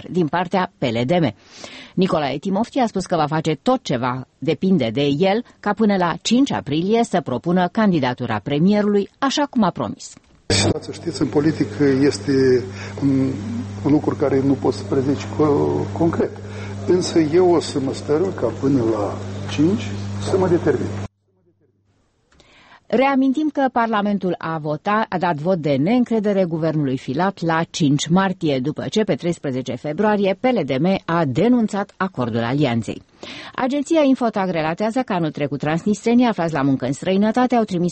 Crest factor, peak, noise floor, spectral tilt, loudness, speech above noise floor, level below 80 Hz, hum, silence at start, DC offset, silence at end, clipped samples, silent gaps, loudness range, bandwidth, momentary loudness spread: 14 dB; -6 dBFS; -62 dBFS; -6 dB/octave; -19 LUFS; 44 dB; -52 dBFS; none; 0 s; under 0.1%; 0 s; under 0.1%; none; 2 LU; 8.8 kHz; 8 LU